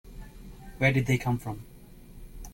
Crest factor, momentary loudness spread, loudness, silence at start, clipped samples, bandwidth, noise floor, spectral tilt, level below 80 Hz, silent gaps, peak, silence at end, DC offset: 22 dB; 24 LU; -27 LUFS; 0.05 s; under 0.1%; 17 kHz; -48 dBFS; -6.5 dB/octave; -46 dBFS; none; -10 dBFS; 0 s; under 0.1%